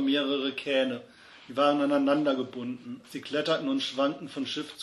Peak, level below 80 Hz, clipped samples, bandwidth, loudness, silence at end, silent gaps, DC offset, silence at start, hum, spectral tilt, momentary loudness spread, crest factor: -12 dBFS; -76 dBFS; under 0.1%; 12 kHz; -28 LUFS; 0 s; none; under 0.1%; 0 s; none; -4.5 dB/octave; 13 LU; 18 dB